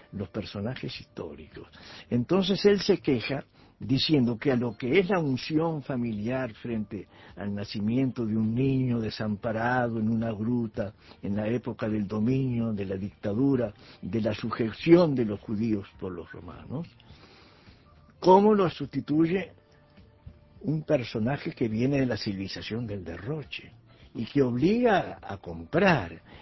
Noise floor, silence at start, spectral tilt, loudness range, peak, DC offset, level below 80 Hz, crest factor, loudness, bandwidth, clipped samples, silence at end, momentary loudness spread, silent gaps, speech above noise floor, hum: -56 dBFS; 0.1 s; -7.5 dB/octave; 4 LU; -6 dBFS; under 0.1%; -54 dBFS; 22 dB; -27 LUFS; 6 kHz; under 0.1%; 0 s; 16 LU; none; 29 dB; none